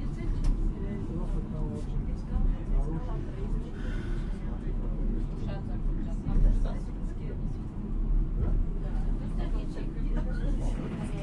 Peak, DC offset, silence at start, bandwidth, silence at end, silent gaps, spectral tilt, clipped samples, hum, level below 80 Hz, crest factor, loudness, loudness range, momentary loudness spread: -14 dBFS; under 0.1%; 0 s; 4.5 kHz; 0 s; none; -8.5 dB/octave; under 0.1%; none; -30 dBFS; 16 dB; -34 LUFS; 2 LU; 5 LU